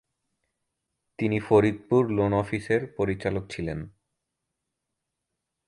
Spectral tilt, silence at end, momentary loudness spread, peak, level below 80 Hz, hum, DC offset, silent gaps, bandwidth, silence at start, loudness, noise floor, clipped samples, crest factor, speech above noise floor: -8 dB/octave; 1.8 s; 12 LU; -6 dBFS; -52 dBFS; none; under 0.1%; none; 11 kHz; 1.2 s; -26 LUFS; -83 dBFS; under 0.1%; 22 dB; 58 dB